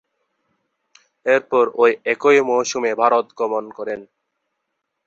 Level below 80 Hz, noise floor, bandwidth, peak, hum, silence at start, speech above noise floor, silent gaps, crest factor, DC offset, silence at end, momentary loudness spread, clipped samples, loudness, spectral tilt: -68 dBFS; -76 dBFS; 7.8 kHz; 0 dBFS; none; 1.25 s; 59 dB; none; 20 dB; under 0.1%; 1.05 s; 13 LU; under 0.1%; -18 LUFS; -3 dB/octave